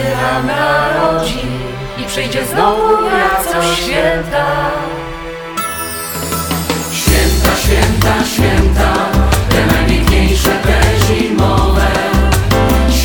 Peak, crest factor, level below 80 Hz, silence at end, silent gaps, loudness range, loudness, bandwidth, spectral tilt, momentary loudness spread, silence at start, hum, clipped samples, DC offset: 0 dBFS; 12 dB; -18 dBFS; 0 s; none; 4 LU; -13 LUFS; over 20 kHz; -4.5 dB/octave; 8 LU; 0 s; none; under 0.1%; under 0.1%